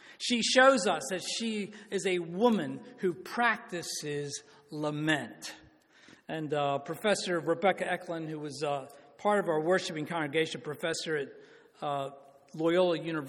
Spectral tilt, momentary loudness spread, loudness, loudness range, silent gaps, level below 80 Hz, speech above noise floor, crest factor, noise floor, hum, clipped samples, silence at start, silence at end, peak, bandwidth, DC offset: -4 dB/octave; 12 LU; -31 LUFS; 5 LU; none; -76 dBFS; 28 dB; 22 dB; -59 dBFS; none; under 0.1%; 0.05 s; 0 s; -10 dBFS; 17.5 kHz; under 0.1%